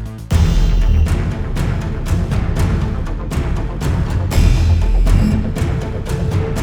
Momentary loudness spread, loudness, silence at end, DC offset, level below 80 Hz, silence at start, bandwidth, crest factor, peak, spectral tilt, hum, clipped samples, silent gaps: 7 LU; -18 LUFS; 0 s; under 0.1%; -18 dBFS; 0 s; 13.5 kHz; 14 dB; 0 dBFS; -7 dB/octave; none; under 0.1%; none